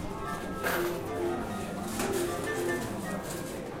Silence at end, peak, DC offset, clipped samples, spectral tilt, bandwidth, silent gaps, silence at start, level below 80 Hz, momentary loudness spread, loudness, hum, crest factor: 0 s; -16 dBFS; under 0.1%; under 0.1%; -4.5 dB/octave; 16 kHz; none; 0 s; -50 dBFS; 5 LU; -33 LUFS; none; 16 dB